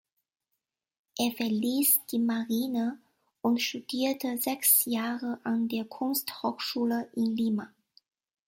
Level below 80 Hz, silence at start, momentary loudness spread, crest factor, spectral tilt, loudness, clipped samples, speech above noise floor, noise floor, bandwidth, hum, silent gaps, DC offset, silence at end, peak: -76 dBFS; 1.15 s; 10 LU; 20 dB; -3 dB/octave; -28 LUFS; under 0.1%; 56 dB; -85 dBFS; 16.5 kHz; none; none; under 0.1%; 0.8 s; -10 dBFS